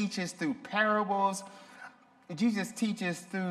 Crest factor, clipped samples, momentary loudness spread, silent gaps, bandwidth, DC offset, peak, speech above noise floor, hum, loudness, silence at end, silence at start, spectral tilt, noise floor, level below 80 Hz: 18 dB; under 0.1%; 21 LU; none; 14 kHz; under 0.1%; -16 dBFS; 21 dB; none; -31 LUFS; 0 s; 0 s; -4.5 dB/octave; -53 dBFS; -80 dBFS